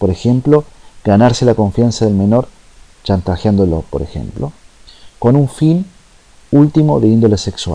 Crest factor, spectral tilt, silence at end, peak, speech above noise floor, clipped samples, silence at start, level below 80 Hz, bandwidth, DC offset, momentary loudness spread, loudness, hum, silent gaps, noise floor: 12 dB; -7.5 dB/octave; 0 s; 0 dBFS; 32 dB; under 0.1%; 0 s; -34 dBFS; 10.5 kHz; under 0.1%; 13 LU; -13 LUFS; none; none; -44 dBFS